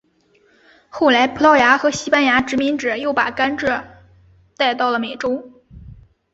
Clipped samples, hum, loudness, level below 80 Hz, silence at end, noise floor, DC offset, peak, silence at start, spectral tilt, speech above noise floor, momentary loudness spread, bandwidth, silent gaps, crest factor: under 0.1%; none; -17 LUFS; -50 dBFS; 0.4 s; -58 dBFS; under 0.1%; 0 dBFS; 0.95 s; -3.5 dB/octave; 41 dB; 11 LU; 8 kHz; none; 18 dB